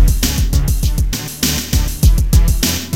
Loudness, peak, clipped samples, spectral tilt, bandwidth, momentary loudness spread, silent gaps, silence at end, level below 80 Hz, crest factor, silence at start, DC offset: -15 LUFS; 0 dBFS; under 0.1%; -4 dB/octave; 17 kHz; 5 LU; none; 0 s; -14 dBFS; 12 dB; 0 s; 1%